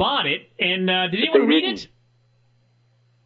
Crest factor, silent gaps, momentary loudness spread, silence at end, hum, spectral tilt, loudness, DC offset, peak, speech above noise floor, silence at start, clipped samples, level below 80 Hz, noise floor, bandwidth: 20 dB; none; 11 LU; 1.4 s; 60 Hz at -50 dBFS; -6 dB/octave; -19 LUFS; under 0.1%; -4 dBFS; 41 dB; 0 s; under 0.1%; -66 dBFS; -61 dBFS; 7.6 kHz